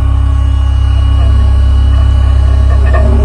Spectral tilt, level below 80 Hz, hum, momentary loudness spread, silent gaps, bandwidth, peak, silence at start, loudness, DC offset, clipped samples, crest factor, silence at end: -7.5 dB/octave; -8 dBFS; none; 2 LU; none; 5 kHz; 0 dBFS; 0 s; -10 LUFS; under 0.1%; under 0.1%; 6 dB; 0 s